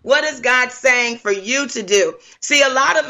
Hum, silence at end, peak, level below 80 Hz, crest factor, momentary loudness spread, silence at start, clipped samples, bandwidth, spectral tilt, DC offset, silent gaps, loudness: none; 0 s; -2 dBFS; -62 dBFS; 16 dB; 7 LU; 0.05 s; under 0.1%; 13.5 kHz; -0.5 dB/octave; under 0.1%; none; -15 LUFS